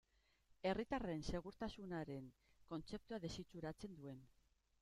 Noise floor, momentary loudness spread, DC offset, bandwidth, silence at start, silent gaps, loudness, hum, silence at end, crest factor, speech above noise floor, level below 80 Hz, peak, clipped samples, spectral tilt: -77 dBFS; 11 LU; under 0.1%; 14.5 kHz; 0.5 s; none; -49 LUFS; none; 0.55 s; 22 dB; 29 dB; -64 dBFS; -28 dBFS; under 0.1%; -6 dB/octave